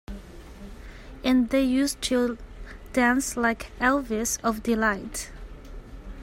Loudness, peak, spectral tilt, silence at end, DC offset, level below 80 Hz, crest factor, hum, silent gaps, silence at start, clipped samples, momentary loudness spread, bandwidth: -25 LUFS; -8 dBFS; -3.5 dB/octave; 0 s; under 0.1%; -42 dBFS; 18 dB; none; none; 0.1 s; under 0.1%; 22 LU; 16 kHz